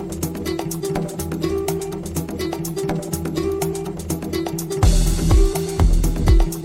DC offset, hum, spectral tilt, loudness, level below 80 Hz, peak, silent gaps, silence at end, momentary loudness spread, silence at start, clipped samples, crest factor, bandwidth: under 0.1%; none; -6 dB/octave; -22 LUFS; -22 dBFS; -4 dBFS; none; 0 s; 8 LU; 0 s; under 0.1%; 16 dB; 16.5 kHz